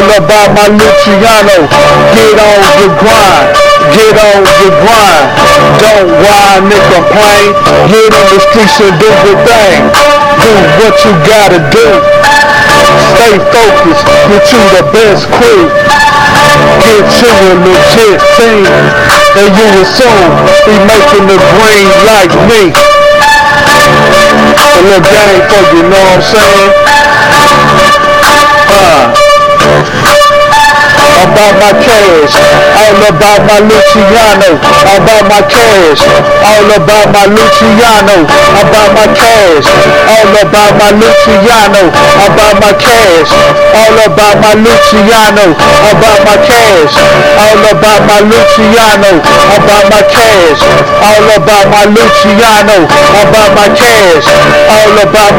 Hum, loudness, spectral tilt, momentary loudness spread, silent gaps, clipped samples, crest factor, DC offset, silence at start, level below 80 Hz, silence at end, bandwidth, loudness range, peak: none; -2 LUFS; -4 dB/octave; 1 LU; none; 20%; 2 dB; under 0.1%; 0 s; -26 dBFS; 0 s; over 20 kHz; 1 LU; 0 dBFS